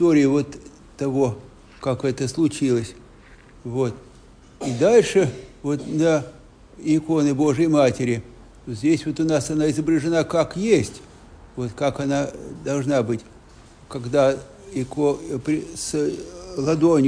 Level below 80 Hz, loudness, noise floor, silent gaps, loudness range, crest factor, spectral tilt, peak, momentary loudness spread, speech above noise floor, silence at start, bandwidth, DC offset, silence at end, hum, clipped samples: -50 dBFS; -22 LUFS; -47 dBFS; none; 4 LU; 18 dB; -6 dB/octave; -4 dBFS; 15 LU; 27 dB; 0 s; 10.5 kHz; under 0.1%; 0 s; none; under 0.1%